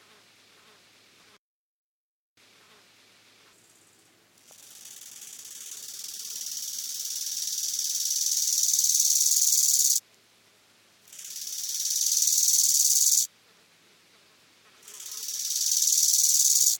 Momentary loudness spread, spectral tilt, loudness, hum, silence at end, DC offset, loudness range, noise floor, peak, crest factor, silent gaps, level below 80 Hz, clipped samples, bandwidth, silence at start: 21 LU; 5 dB/octave; -22 LUFS; none; 0 s; under 0.1%; 15 LU; -61 dBFS; -8 dBFS; 20 dB; none; under -90 dBFS; under 0.1%; 19 kHz; 4.6 s